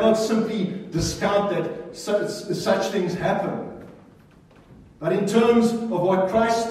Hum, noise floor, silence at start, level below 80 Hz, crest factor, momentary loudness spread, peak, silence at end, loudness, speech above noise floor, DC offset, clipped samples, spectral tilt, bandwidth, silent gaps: none; -51 dBFS; 0 s; -50 dBFS; 16 dB; 11 LU; -6 dBFS; 0 s; -23 LUFS; 29 dB; under 0.1%; under 0.1%; -5.5 dB/octave; 14.5 kHz; none